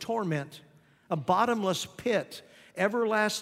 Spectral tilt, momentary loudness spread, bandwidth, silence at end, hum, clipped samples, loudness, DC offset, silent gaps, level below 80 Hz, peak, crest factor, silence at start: -4.5 dB/octave; 17 LU; 16 kHz; 0 s; none; under 0.1%; -29 LUFS; under 0.1%; none; -70 dBFS; -10 dBFS; 18 dB; 0 s